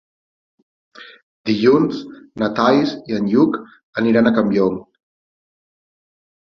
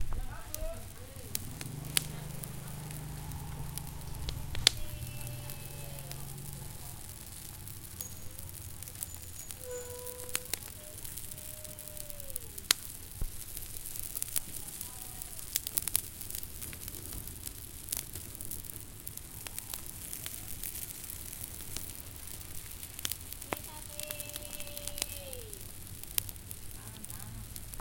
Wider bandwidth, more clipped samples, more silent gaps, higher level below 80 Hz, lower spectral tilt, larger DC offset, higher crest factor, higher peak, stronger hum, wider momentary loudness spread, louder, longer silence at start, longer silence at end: second, 6.6 kHz vs 17 kHz; neither; first, 1.23-1.44 s, 3.83-3.93 s vs none; second, -58 dBFS vs -48 dBFS; first, -7.5 dB/octave vs -2 dB/octave; neither; second, 18 dB vs 40 dB; about the same, -2 dBFS vs 0 dBFS; neither; first, 14 LU vs 11 LU; first, -17 LUFS vs -38 LUFS; first, 1 s vs 0 s; first, 1.75 s vs 0 s